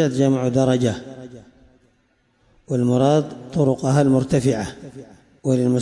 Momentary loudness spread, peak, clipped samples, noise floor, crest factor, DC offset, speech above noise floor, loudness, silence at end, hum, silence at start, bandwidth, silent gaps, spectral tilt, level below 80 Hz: 20 LU; -6 dBFS; under 0.1%; -63 dBFS; 14 dB; under 0.1%; 45 dB; -19 LUFS; 0 s; none; 0 s; 11.5 kHz; none; -7 dB/octave; -52 dBFS